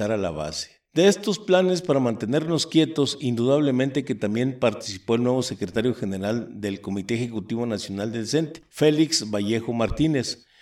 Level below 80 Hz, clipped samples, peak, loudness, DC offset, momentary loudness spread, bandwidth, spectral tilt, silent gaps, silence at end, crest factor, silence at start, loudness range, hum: -50 dBFS; under 0.1%; -4 dBFS; -24 LUFS; under 0.1%; 9 LU; 15 kHz; -5 dB/octave; none; 0.25 s; 18 dB; 0 s; 5 LU; none